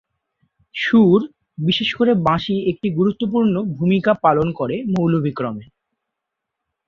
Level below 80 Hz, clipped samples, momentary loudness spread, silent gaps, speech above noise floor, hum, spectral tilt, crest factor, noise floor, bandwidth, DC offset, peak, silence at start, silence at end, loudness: -52 dBFS; under 0.1%; 9 LU; none; 64 dB; none; -8 dB/octave; 16 dB; -81 dBFS; 6.8 kHz; under 0.1%; -2 dBFS; 0.75 s; 1.25 s; -18 LUFS